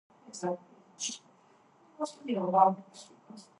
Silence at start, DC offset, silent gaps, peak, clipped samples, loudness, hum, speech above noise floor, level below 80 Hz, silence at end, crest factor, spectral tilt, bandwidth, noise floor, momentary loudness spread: 0.3 s; under 0.1%; none; -10 dBFS; under 0.1%; -31 LUFS; none; 32 dB; -90 dBFS; 0.2 s; 24 dB; -4.5 dB/octave; 11.5 kHz; -63 dBFS; 26 LU